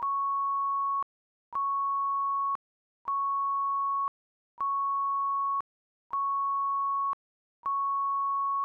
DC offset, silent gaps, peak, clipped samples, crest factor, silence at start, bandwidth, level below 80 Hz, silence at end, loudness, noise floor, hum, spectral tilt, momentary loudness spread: under 0.1%; 1.03-1.52 s, 2.55-3.05 s, 4.08-4.58 s, 5.61-6.10 s, 7.13-7.63 s; -26 dBFS; under 0.1%; 4 dB; 0 s; 1.7 kHz; -80 dBFS; 0 s; -30 LUFS; under -90 dBFS; none; 12 dB/octave; 7 LU